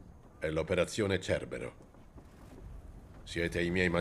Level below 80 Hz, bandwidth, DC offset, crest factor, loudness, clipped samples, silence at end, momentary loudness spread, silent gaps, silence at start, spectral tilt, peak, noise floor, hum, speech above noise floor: -54 dBFS; 13.5 kHz; under 0.1%; 20 dB; -34 LUFS; under 0.1%; 0 s; 22 LU; none; 0 s; -5.5 dB/octave; -14 dBFS; -54 dBFS; none; 21 dB